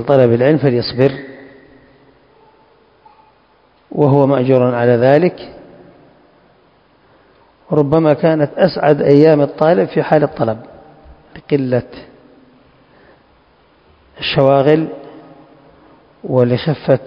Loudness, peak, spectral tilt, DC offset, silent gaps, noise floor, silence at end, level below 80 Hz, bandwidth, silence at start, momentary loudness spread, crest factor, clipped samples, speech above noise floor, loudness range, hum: -13 LUFS; 0 dBFS; -9.5 dB/octave; under 0.1%; none; -52 dBFS; 0 s; -52 dBFS; 5.8 kHz; 0 s; 15 LU; 16 dB; 0.2%; 40 dB; 10 LU; none